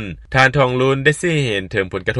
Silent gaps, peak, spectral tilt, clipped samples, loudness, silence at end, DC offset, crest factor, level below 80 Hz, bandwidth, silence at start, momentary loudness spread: none; 0 dBFS; -5.5 dB/octave; under 0.1%; -16 LUFS; 0 s; under 0.1%; 16 dB; -40 dBFS; 11.5 kHz; 0 s; 7 LU